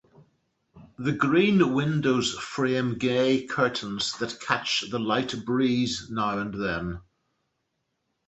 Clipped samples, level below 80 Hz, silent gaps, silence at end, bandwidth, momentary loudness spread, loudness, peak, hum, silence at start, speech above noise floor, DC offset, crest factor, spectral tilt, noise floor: under 0.1%; -56 dBFS; none; 1.25 s; 8.2 kHz; 8 LU; -26 LUFS; -6 dBFS; none; 0.75 s; 52 dB; under 0.1%; 22 dB; -5 dB/octave; -78 dBFS